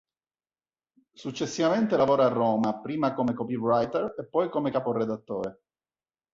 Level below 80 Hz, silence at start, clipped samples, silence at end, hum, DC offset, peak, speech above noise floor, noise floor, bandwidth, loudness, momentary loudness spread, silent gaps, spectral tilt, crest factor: -66 dBFS; 1.2 s; under 0.1%; 0.8 s; none; under 0.1%; -10 dBFS; over 64 dB; under -90 dBFS; 7.8 kHz; -27 LUFS; 11 LU; none; -6.5 dB/octave; 16 dB